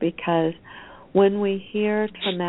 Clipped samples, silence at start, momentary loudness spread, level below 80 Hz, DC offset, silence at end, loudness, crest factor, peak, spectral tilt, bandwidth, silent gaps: under 0.1%; 0 s; 20 LU; -60 dBFS; under 0.1%; 0 s; -23 LUFS; 18 dB; -6 dBFS; -11 dB/octave; 4.1 kHz; none